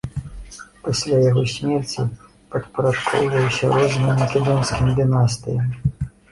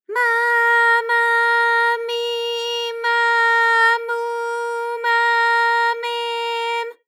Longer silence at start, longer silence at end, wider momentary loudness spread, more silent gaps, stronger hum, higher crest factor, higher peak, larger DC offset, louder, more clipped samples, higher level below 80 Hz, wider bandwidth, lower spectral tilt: about the same, 0.05 s vs 0.1 s; about the same, 0.25 s vs 0.15 s; first, 14 LU vs 9 LU; neither; neither; about the same, 16 dB vs 12 dB; about the same, -4 dBFS vs -6 dBFS; neither; second, -20 LUFS vs -17 LUFS; neither; first, -40 dBFS vs under -90 dBFS; second, 11.5 kHz vs 16.5 kHz; first, -6 dB/octave vs 4 dB/octave